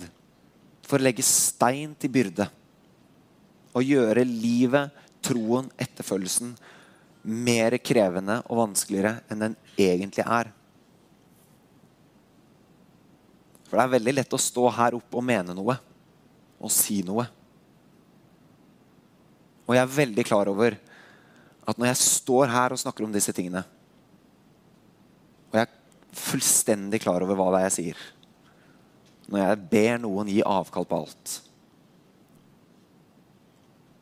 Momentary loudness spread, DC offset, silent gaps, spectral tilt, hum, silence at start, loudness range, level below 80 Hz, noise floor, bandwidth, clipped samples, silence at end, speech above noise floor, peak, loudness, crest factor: 13 LU; under 0.1%; none; -4 dB/octave; none; 0 s; 6 LU; -70 dBFS; -58 dBFS; 16.5 kHz; under 0.1%; 2.65 s; 34 dB; -4 dBFS; -25 LUFS; 24 dB